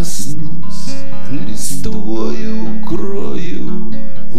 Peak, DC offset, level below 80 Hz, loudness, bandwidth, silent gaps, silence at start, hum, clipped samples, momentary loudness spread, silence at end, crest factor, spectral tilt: 0 dBFS; 70%; -38 dBFS; -24 LUFS; 16 kHz; none; 0 s; none; under 0.1%; 7 LU; 0 s; 14 dB; -5.5 dB/octave